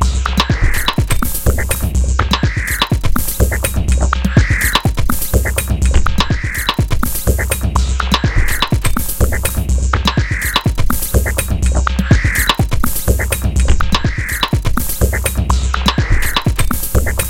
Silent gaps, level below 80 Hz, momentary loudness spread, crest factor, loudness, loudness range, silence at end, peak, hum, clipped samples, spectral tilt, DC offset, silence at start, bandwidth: none; -16 dBFS; 4 LU; 14 dB; -15 LUFS; 1 LU; 0 s; 0 dBFS; none; under 0.1%; -4 dB/octave; under 0.1%; 0 s; 17.5 kHz